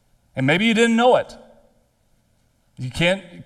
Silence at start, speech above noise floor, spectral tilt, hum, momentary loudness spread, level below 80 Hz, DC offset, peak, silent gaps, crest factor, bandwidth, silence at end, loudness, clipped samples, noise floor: 0.35 s; 44 dB; -5 dB/octave; none; 18 LU; -50 dBFS; under 0.1%; -4 dBFS; none; 18 dB; 12.5 kHz; 0.05 s; -18 LUFS; under 0.1%; -63 dBFS